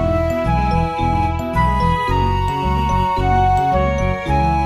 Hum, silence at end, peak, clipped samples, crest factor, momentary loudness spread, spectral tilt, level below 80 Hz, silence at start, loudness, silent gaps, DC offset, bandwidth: none; 0 s; -4 dBFS; under 0.1%; 12 dB; 3 LU; -7 dB/octave; -24 dBFS; 0 s; -17 LUFS; none; under 0.1%; 13.5 kHz